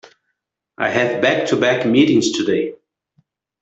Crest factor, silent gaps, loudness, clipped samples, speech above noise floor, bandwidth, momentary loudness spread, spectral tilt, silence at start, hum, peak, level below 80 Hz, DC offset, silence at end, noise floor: 16 dB; none; -17 LUFS; under 0.1%; 59 dB; 8.2 kHz; 8 LU; -4.5 dB/octave; 0.8 s; none; -2 dBFS; -60 dBFS; under 0.1%; 0.85 s; -75 dBFS